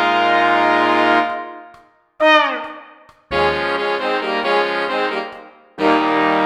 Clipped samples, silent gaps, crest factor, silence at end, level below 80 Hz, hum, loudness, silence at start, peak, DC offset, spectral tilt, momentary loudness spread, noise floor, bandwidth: under 0.1%; none; 18 dB; 0 s; -50 dBFS; none; -16 LUFS; 0 s; 0 dBFS; under 0.1%; -4.5 dB/octave; 13 LU; -48 dBFS; 11.5 kHz